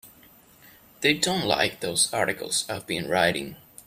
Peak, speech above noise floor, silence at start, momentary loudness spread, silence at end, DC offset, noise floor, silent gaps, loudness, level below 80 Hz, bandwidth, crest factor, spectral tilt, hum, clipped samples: -6 dBFS; 29 dB; 0.05 s; 8 LU; 0.3 s; under 0.1%; -54 dBFS; none; -24 LUFS; -60 dBFS; 16 kHz; 22 dB; -2.5 dB/octave; none; under 0.1%